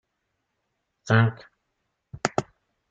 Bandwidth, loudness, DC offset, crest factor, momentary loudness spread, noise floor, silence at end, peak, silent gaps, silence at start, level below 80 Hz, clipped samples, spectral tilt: 7.8 kHz; -25 LUFS; under 0.1%; 24 dB; 10 LU; -78 dBFS; 0.5 s; -4 dBFS; none; 1.05 s; -64 dBFS; under 0.1%; -6 dB/octave